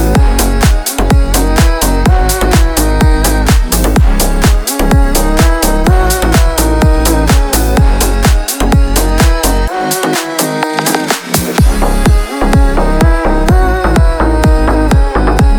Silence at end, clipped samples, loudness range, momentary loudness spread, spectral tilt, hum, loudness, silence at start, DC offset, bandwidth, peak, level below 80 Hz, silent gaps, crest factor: 0 s; under 0.1%; 2 LU; 3 LU; -5 dB/octave; none; -11 LUFS; 0 s; under 0.1%; over 20 kHz; 0 dBFS; -10 dBFS; none; 8 dB